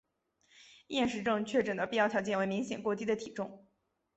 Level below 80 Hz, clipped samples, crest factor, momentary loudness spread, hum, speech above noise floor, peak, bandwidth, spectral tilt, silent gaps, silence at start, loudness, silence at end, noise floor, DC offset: -70 dBFS; under 0.1%; 18 dB; 8 LU; none; 39 dB; -16 dBFS; 8.2 kHz; -5 dB/octave; none; 0.6 s; -33 LUFS; 0.6 s; -72 dBFS; under 0.1%